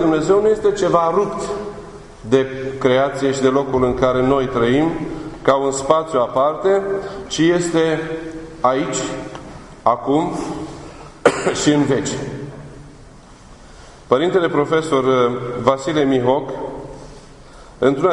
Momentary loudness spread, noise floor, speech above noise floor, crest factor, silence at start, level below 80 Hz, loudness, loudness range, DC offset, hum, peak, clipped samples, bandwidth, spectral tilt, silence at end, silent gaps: 16 LU; -41 dBFS; 25 dB; 18 dB; 0 s; -44 dBFS; -18 LUFS; 4 LU; under 0.1%; none; 0 dBFS; under 0.1%; 11 kHz; -5.5 dB/octave; 0 s; none